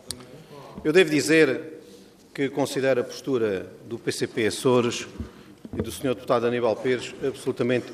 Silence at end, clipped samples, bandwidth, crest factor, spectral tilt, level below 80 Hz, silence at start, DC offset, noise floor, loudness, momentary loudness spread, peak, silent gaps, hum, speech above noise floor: 0 s; under 0.1%; 15.5 kHz; 20 dB; -4.5 dB/octave; -56 dBFS; 0.05 s; under 0.1%; -49 dBFS; -24 LUFS; 20 LU; -4 dBFS; none; none; 25 dB